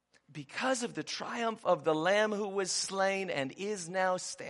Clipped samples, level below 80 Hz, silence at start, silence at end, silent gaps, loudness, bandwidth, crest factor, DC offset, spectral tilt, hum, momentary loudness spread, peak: under 0.1%; -80 dBFS; 0.3 s; 0 s; none; -32 LUFS; 11.5 kHz; 18 dB; under 0.1%; -3 dB/octave; none; 9 LU; -14 dBFS